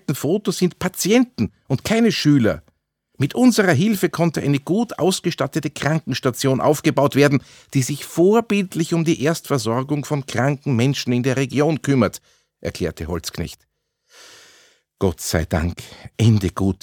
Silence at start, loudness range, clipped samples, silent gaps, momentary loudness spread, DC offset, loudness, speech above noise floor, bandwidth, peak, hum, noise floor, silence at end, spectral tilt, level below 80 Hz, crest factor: 0.1 s; 8 LU; under 0.1%; none; 10 LU; under 0.1%; -19 LUFS; 46 dB; 18 kHz; -2 dBFS; none; -65 dBFS; 0.1 s; -5.5 dB/octave; -48 dBFS; 18 dB